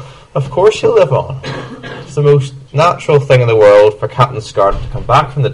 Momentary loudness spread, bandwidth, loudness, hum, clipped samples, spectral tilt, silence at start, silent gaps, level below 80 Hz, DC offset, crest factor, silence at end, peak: 16 LU; 11 kHz; -11 LUFS; none; 0.2%; -6.5 dB/octave; 0 s; none; -32 dBFS; under 0.1%; 12 dB; 0 s; 0 dBFS